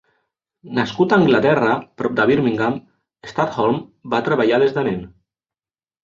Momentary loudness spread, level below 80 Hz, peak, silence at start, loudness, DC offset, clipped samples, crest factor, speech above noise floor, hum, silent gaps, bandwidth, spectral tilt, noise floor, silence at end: 11 LU; -56 dBFS; -2 dBFS; 0.65 s; -18 LUFS; under 0.1%; under 0.1%; 16 dB; over 73 dB; none; none; 7.4 kHz; -7 dB/octave; under -90 dBFS; 0.95 s